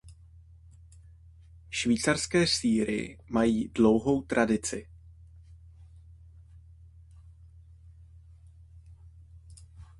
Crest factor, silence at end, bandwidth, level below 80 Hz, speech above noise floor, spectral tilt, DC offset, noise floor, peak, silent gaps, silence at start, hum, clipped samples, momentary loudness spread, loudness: 22 dB; 0.15 s; 11.5 kHz; -52 dBFS; 27 dB; -4.5 dB/octave; under 0.1%; -53 dBFS; -8 dBFS; none; 0.05 s; none; under 0.1%; 11 LU; -27 LUFS